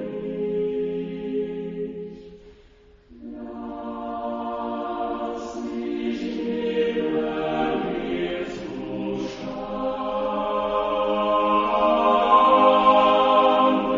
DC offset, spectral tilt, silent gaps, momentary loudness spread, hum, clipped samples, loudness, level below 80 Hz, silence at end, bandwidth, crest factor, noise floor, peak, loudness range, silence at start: under 0.1%; -6 dB/octave; none; 16 LU; none; under 0.1%; -23 LUFS; -52 dBFS; 0 s; 7.6 kHz; 20 dB; -52 dBFS; -4 dBFS; 14 LU; 0 s